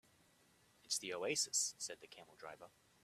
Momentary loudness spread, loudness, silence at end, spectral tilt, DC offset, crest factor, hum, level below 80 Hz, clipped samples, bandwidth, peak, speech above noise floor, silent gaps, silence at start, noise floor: 19 LU; -40 LUFS; 0.35 s; 0 dB/octave; under 0.1%; 22 dB; none; -86 dBFS; under 0.1%; 15.5 kHz; -24 dBFS; 28 dB; none; 0.9 s; -72 dBFS